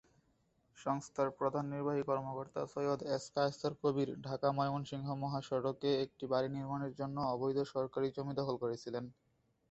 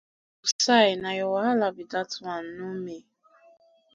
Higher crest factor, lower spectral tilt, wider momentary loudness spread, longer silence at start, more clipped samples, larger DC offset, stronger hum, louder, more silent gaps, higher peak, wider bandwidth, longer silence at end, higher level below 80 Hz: about the same, 20 dB vs 20 dB; first, -6 dB/octave vs -3 dB/octave; second, 6 LU vs 16 LU; first, 0.75 s vs 0.45 s; neither; neither; neither; second, -38 LUFS vs -26 LUFS; second, none vs 0.52-0.59 s; second, -18 dBFS vs -8 dBFS; second, 8 kHz vs 10 kHz; second, 0.6 s vs 0.95 s; about the same, -72 dBFS vs -72 dBFS